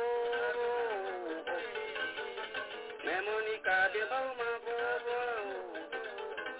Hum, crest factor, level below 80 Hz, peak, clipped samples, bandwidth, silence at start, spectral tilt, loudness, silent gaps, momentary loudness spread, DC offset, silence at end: none; 16 dB; -74 dBFS; -20 dBFS; under 0.1%; 4 kHz; 0 s; 1 dB/octave; -36 LUFS; none; 9 LU; under 0.1%; 0 s